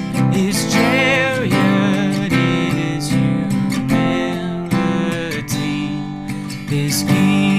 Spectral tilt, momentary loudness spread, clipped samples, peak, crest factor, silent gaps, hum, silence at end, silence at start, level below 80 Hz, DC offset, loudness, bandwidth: -5.5 dB/octave; 8 LU; under 0.1%; 0 dBFS; 16 dB; none; none; 0 s; 0 s; -44 dBFS; under 0.1%; -17 LUFS; 15.5 kHz